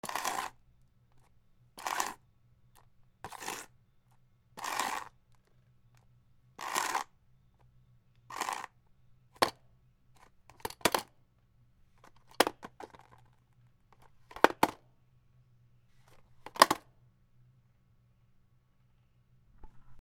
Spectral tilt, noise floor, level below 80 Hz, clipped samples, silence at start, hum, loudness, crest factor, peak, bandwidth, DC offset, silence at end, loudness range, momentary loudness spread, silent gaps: -2 dB/octave; -67 dBFS; -68 dBFS; under 0.1%; 0.05 s; none; -33 LUFS; 38 dB; 0 dBFS; 19 kHz; under 0.1%; 0.05 s; 9 LU; 25 LU; none